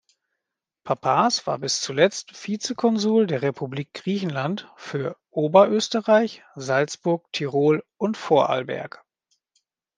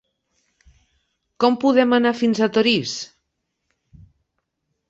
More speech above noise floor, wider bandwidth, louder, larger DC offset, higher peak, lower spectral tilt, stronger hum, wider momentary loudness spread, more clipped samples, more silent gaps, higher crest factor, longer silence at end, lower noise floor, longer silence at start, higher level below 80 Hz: first, 62 dB vs 58 dB; first, 10 kHz vs 7.8 kHz; second, -23 LUFS vs -18 LUFS; neither; about the same, -2 dBFS vs -2 dBFS; about the same, -4.5 dB/octave vs -4.5 dB/octave; neither; about the same, 12 LU vs 13 LU; neither; neither; about the same, 22 dB vs 20 dB; second, 1.1 s vs 1.85 s; first, -85 dBFS vs -76 dBFS; second, 0.85 s vs 1.4 s; second, -72 dBFS vs -62 dBFS